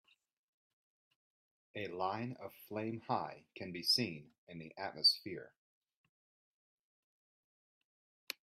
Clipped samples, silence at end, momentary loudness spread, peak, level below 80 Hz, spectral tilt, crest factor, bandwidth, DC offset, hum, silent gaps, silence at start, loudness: under 0.1%; 2.95 s; 21 LU; -20 dBFS; -84 dBFS; -3.5 dB/octave; 24 dB; 15.5 kHz; under 0.1%; none; 4.38-4.47 s; 1.75 s; -36 LUFS